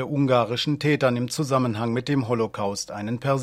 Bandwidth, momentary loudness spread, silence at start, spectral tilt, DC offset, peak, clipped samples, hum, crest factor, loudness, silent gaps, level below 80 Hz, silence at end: 15 kHz; 7 LU; 0 s; -5.5 dB/octave; under 0.1%; -6 dBFS; under 0.1%; none; 18 dB; -24 LUFS; none; -60 dBFS; 0 s